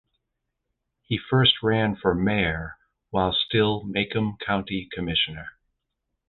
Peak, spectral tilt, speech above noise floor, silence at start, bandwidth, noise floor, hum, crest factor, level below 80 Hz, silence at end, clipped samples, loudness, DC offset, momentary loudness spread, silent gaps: -6 dBFS; -9 dB/octave; 56 dB; 1.1 s; 4.4 kHz; -80 dBFS; none; 20 dB; -46 dBFS; 0.8 s; under 0.1%; -24 LUFS; under 0.1%; 12 LU; none